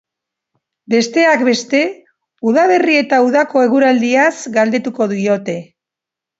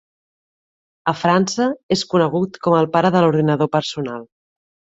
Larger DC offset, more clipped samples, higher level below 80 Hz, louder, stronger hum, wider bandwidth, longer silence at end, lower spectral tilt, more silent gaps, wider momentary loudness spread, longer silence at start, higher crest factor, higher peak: neither; neither; second, -68 dBFS vs -58 dBFS; first, -14 LUFS vs -18 LUFS; neither; about the same, 8 kHz vs 8 kHz; about the same, 0.75 s vs 0.7 s; second, -4.5 dB/octave vs -6 dB/octave; second, none vs 1.83-1.89 s; second, 7 LU vs 10 LU; second, 0.9 s vs 1.05 s; about the same, 14 dB vs 18 dB; about the same, 0 dBFS vs -2 dBFS